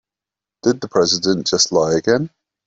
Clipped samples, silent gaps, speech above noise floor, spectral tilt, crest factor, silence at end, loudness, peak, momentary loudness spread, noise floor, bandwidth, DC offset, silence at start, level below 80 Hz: under 0.1%; none; 71 dB; -3.5 dB/octave; 16 dB; 0.4 s; -17 LUFS; -2 dBFS; 6 LU; -88 dBFS; 8 kHz; under 0.1%; 0.65 s; -56 dBFS